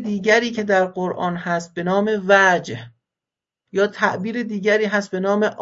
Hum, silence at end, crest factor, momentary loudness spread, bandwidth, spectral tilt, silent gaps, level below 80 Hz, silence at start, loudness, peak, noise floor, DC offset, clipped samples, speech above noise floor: none; 0 s; 20 dB; 10 LU; 7.8 kHz; -5 dB/octave; none; -64 dBFS; 0 s; -19 LUFS; 0 dBFS; -88 dBFS; under 0.1%; under 0.1%; 69 dB